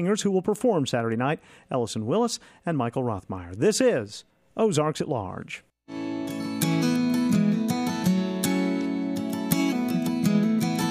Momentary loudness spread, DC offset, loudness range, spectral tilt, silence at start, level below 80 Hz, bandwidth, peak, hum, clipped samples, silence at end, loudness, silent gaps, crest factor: 11 LU; under 0.1%; 2 LU; -5.5 dB/octave; 0 s; -64 dBFS; 15.5 kHz; -6 dBFS; none; under 0.1%; 0 s; -26 LUFS; none; 20 dB